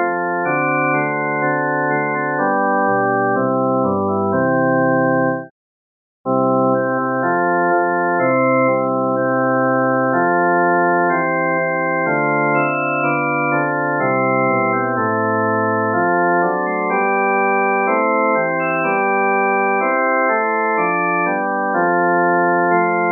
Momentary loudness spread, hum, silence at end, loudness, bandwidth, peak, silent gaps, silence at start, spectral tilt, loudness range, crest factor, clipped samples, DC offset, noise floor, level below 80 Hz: 3 LU; none; 0 s; -16 LUFS; 2.8 kHz; -4 dBFS; 5.50-6.24 s; 0 s; -13.5 dB/octave; 2 LU; 12 dB; under 0.1%; under 0.1%; under -90 dBFS; -74 dBFS